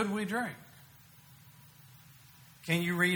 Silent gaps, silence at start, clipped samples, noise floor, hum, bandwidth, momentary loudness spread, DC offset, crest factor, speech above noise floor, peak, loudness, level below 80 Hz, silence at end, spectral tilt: none; 0 s; under 0.1%; -57 dBFS; none; over 20 kHz; 24 LU; under 0.1%; 22 dB; 26 dB; -14 dBFS; -33 LUFS; -72 dBFS; 0 s; -5 dB/octave